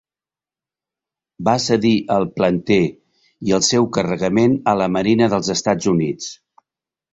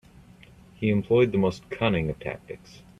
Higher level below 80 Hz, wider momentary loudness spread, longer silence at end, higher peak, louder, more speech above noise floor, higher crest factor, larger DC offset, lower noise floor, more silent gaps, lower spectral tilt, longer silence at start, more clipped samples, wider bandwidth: about the same, -52 dBFS vs -52 dBFS; second, 8 LU vs 18 LU; first, 0.8 s vs 0.45 s; first, -2 dBFS vs -8 dBFS; first, -18 LUFS vs -25 LUFS; first, over 73 dB vs 26 dB; about the same, 16 dB vs 18 dB; neither; first, under -90 dBFS vs -51 dBFS; neither; second, -5 dB/octave vs -7.5 dB/octave; first, 1.4 s vs 0.8 s; neither; second, 8.2 kHz vs 11 kHz